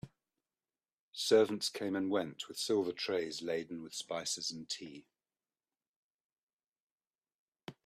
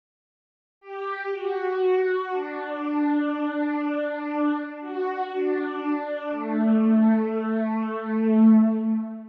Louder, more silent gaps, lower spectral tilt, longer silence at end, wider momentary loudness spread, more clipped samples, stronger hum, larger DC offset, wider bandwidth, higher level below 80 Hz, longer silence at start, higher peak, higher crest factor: second, -36 LUFS vs -24 LUFS; first, 1.00-1.13 s, 5.88-6.30 s, 6.38-6.59 s, 6.68-6.73 s, 6.80-6.98 s, 7.35-7.52 s vs none; second, -3 dB/octave vs -9.5 dB/octave; first, 0.15 s vs 0 s; first, 18 LU vs 11 LU; neither; neither; neither; first, 14 kHz vs 4.7 kHz; about the same, -80 dBFS vs -82 dBFS; second, 0.05 s vs 0.85 s; second, -14 dBFS vs -10 dBFS; first, 24 dB vs 14 dB